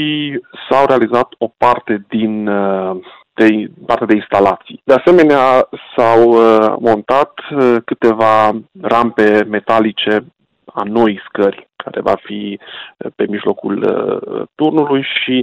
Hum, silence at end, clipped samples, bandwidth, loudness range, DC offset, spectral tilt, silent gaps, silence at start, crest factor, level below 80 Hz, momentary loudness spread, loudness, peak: none; 0 s; under 0.1%; 9 kHz; 7 LU; under 0.1%; -7 dB/octave; none; 0 s; 12 dB; -52 dBFS; 14 LU; -13 LUFS; -2 dBFS